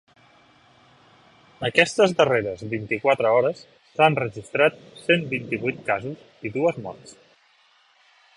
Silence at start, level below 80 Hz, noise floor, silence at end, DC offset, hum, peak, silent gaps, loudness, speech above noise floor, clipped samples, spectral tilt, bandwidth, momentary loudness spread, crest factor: 1.6 s; -62 dBFS; -60 dBFS; 1.25 s; under 0.1%; none; -2 dBFS; none; -22 LUFS; 37 dB; under 0.1%; -5 dB/octave; 11.5 kHz; 16 LU; 24 dB